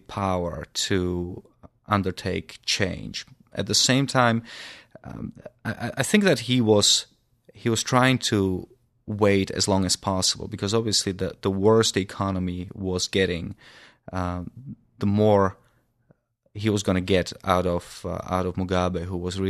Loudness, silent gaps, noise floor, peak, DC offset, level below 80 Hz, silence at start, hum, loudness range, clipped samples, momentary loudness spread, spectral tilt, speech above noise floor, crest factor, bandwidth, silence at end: -23 LUFS; none; -64 dBFS; -4 dBFS; under 0.1%; -52 dBFS; 0.1 s; none; 5 LU; under 0.1%; 16 LU; -4 dB/octave; 40 dB; 22 dB; 14 kHz; 0 s